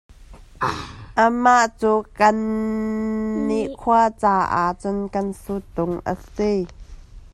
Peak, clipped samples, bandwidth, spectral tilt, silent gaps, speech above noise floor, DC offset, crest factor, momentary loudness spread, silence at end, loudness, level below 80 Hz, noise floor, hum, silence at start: -2 dBFS; under 0.1%; 12.5 kHz; -5.5 dB/octave; none; 23 dB; under 0.1%; 18 dB; 10 LU; 0.05 s; -21 LUFS; -44 dBFS; -43 dBFS; none; 0.2 s